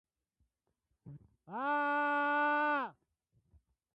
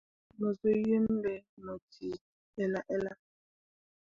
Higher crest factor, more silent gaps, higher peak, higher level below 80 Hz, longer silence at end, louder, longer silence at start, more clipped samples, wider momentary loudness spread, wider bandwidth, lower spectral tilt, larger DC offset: about the same, 12 dB vs 16 dB; second, none vs 1.49-1.57 s, 1.82-1.88 s, 2.21-2.53 s; second, -24 dBFS vs -18 dBFS; second, -78 dBFS vs -66 dBFS; about the same, 1.05 s vs 1 s; about the same, -33 LUFS vs -34 LUFS; first, 1.05 s vs 0.4 s; neither; second, 11 LU vs 16 LU; first, 8.2 kHz vs 7 kHz; second, -6.5 dB/octave vs -8.5 dB/octave; neither